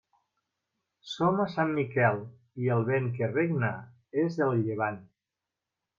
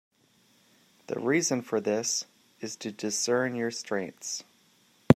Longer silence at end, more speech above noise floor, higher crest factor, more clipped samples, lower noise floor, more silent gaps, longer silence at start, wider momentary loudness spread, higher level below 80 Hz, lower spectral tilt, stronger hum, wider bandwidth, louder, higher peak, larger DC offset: first, 0.95 s vs 0 s; first, 60 dB vs 35 dB; second, 20 dB vs 28 dB; neither; first, -88 dBFS vs -65 dBFS; neither; about the same, 1.05 s vs 1.1 s; about the same, 10 LU vs 11 LU; about the same, -74 dBFS vs -78 dBFS; first, -8 dB/octave vs -4 dB/octave; neither; second, 7.2 kHz vs 16 kHz; about the same, -29 LUFS vs -30 LUFS; second, -10 dBFS vs -2 dBFS; neither